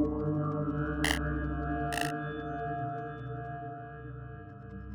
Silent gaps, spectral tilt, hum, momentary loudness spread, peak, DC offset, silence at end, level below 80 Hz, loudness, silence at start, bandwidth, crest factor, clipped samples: none; -5.5 dB/octave; 50 Hz at -45 dBFS; 14 LU; -10 dBFS; under 0.1%; 0 s; -44 dBFS; -34 LUFS; 0 s; over 20 kHz; 24 dB; under 0.1%